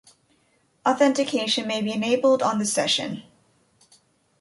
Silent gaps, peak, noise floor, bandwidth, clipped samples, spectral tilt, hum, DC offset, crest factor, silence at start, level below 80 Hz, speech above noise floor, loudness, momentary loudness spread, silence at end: none; -8 dBFS; -65 dBFS; 11.5 kHz; under 0.1%; -3 dB/octave; none; under 0.1%; 16 dB; 0.85 s; -70 dBFS; 43 dB; -22 LUFS; 6 LU; 1.2 s